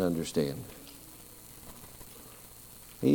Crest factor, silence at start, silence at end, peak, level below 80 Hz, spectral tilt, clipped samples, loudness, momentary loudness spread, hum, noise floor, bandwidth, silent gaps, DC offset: 22 dB; 0 s; 0 s; -12 dBFS; -58 dBFS; -6 dB/octave; under 0.1%; -37 LUFS; 17 LU; 60 Hz at -60 dBFS; -51 dBFS; 19 kHz; none; under 0.1%